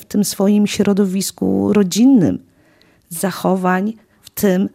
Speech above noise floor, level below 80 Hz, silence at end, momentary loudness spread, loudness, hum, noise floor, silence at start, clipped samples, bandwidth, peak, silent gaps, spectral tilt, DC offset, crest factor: 38 dB; -56 dBFS; 0.05 s; 13 LU; -16 LUFS; none; -53 dBFS; 0 s; under 0.1%; 16 kHz; -2 dBFS; none; -5.5 dB/octave; under 0.1%; 14 dB